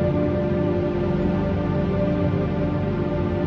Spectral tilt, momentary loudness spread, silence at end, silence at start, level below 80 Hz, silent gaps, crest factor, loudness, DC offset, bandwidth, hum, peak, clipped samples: -10 dB/octave; 2 LU; 0 s; 0 s; -36 dBFS; none; 12 dB; -23 LUFS; under 0.1%; 6.2 kHz; 50 Hz at -35 dBFS; -10 dBFS; under 0.1%